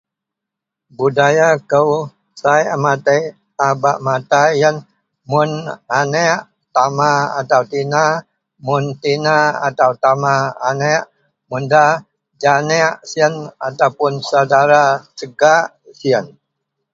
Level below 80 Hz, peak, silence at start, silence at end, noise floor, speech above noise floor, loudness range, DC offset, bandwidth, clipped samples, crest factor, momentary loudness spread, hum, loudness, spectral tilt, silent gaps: -62 dBFS; 0 dBFS; 1 s; 0.65 s; -82 dBFS; 68 dB; 2 LU; under 0.1%; 7.8 kHz; under 0.1%; 16 dB; 9 LU; none; -15 LUFS; -4.5 dB/octave; none